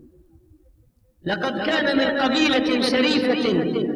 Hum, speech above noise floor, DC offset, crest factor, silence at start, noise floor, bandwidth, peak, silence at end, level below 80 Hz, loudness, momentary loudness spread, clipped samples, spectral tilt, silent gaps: none; 38 dB; under 0.1%; 14 dB; 1.25 s; -58 dBFS; 12 kHz; -8 dBFS; 0 s; -54 dBFS; -20 LUFS; 6 LU; under 0.1%; -4.5 dB/octave; none